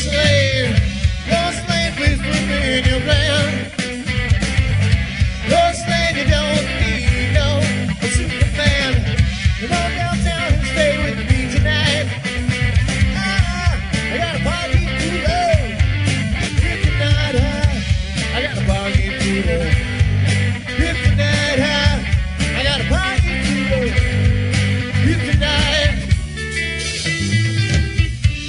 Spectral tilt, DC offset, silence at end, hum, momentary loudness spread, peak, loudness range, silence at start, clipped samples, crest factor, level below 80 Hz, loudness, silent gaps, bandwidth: -5 dB/octave; under 0.1%; 0 s; none; 5 LU; -2 dBFS; 1 LU; 0 s; under 0.1%; 16 dB; -22 dBFS; -17 LUFS; none; 11 kHz